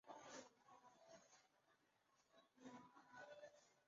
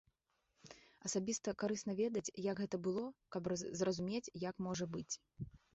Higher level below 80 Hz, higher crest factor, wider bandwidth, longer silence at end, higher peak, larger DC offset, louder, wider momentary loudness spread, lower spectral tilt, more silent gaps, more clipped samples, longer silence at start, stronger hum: second, under -90 dBFS vs -70 dBFS; about the same, 20 dB vs 16 dB; about the same, 7.4 kHz vs 8 kHz; second, 0 s vs 0.2 s; second, -46 dBFS vs -26 dBFS; neither; second, -64 LUFS vs -41 LUFS; about the same, 9 LU vs 9 LU; second, -2 dB/octave vs -6 dB/octave; neither; neither; second, 0.05 s vs 0.65 s; neither